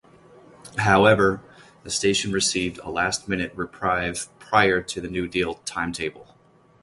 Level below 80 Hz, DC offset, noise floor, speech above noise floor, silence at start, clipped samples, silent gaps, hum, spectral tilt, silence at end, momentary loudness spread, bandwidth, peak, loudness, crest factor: -48 dBFS; under 0.1%; -50 dBFS; 27 dB; 0.65 s; under 0.1%; none; none; -3.5 dB/octave; 0.6 s; 13 LU; 11.5 kHz; -2 dBFS; -23 LUFS; 22 dB